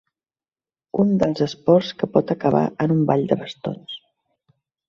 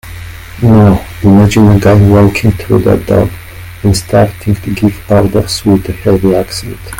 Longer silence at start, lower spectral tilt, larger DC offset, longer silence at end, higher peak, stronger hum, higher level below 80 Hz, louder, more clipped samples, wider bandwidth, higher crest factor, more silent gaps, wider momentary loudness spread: first, 0.95 s vs 0.05 s; about the same, -8 dB/octave vs -7 dB/octave; neither; first, 0.9 s vs 0 s; about the same, -2 dBFS vs 0 dBFS; neither; second, -58 dBFS vs -28 dBFS; second, -20 LUFS vs -9 LUFS; second, under 0.1% vs 0.5%; second, 7.4 kHz vs 17 kHz; first, 20 dB vs 8 dB; neither; about the same, 12 LU vs 12 LU